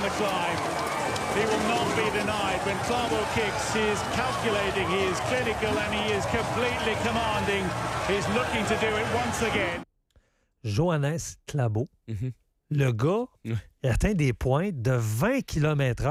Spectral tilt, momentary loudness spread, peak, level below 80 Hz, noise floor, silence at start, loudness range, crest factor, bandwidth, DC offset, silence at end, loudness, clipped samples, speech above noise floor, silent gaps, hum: -5 dB/octave; 6 LU; -12 dBFS; -44 dBFS; -65 dBFS; 0 s; 3 LU; 16 dB; 15.5 kHz; under 0.1%; 0 s; -27 LUFS; under 0.1%; 38 dB; none; none